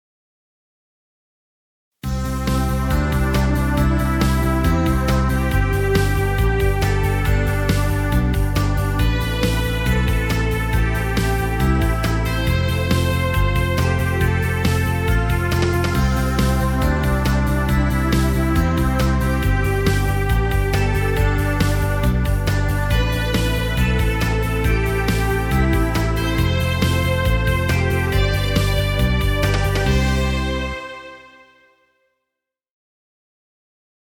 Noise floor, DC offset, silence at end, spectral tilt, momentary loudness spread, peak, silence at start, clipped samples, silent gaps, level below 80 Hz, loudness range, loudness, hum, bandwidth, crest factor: -82 dBFS; under 0.1%; 2.85 s; -6 dB/octave; 2 LU; -2 dBFS; 2.05 s; under 0.1%; none; -22 dBFS; 3 LU; -19 LUFS; none; 19 kHz; 16 dB